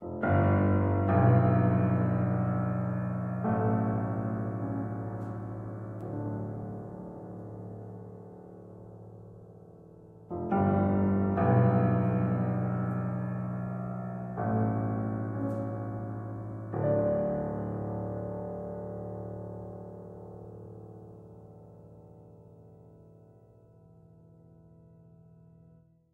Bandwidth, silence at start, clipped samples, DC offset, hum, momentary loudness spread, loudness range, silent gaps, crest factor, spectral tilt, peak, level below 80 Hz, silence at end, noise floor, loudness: 3.1 kHz; 0 s; under 0.1%; under 0.1%; none; 23 LU; 18 LU; none; 20 dB; -12 dB/octave; -12 dBFS; -58 dBFS; 3.05 s; -60 dBFS; -30 LUFS